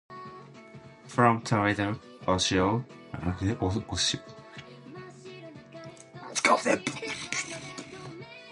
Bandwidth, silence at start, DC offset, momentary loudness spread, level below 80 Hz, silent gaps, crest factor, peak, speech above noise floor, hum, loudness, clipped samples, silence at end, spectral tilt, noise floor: 11.5 kHz; 0.1 s; under 0.1%; 22 LU; -50 dBFS; none; 24 dB; -6 dBFS; 21 dB; none; -28 LUFS; under 0.1%; 0 s; -4 dB/octave; -49 dBFS